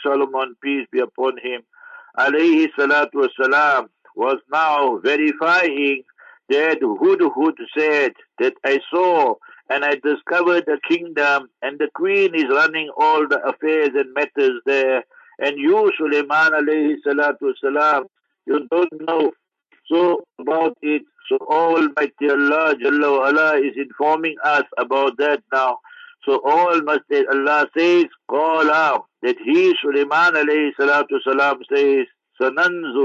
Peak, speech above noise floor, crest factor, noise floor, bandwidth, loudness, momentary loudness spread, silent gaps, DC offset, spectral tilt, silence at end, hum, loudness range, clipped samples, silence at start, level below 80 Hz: -4 dBFS; 33 dB; 14 dB; -51 dBFS; 7.6 kHz; -18 LUFS; 7 LU; none; under 0.1%; -4.5 dB/octave; 0 s; none; 3 LU; under 0.1%; 0 s; -78 dBFS